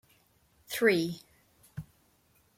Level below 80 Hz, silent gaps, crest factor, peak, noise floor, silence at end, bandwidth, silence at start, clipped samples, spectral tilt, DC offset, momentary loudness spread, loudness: -68 dBFS; none; 22 dB; -12 dBFS; -68 dBFS; 0.75 s; 16.5 kHz; 0.7 s; under 0.1%; -4.5 dB/octave; under 0.1%; 21 LU; -29 LUFS